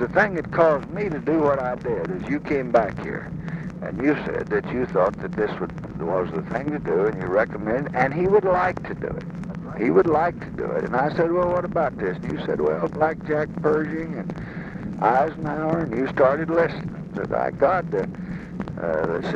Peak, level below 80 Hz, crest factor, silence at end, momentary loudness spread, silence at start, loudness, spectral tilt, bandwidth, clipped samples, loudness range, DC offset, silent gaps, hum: -4 dBFS; -46 dBFS; 20 dB; 0 s; 12 LU; 0 s; -24 LUFS; -8.5 dB/octave; 8 kHz; under 0.1%; 3 LU; under 0.1%; none; none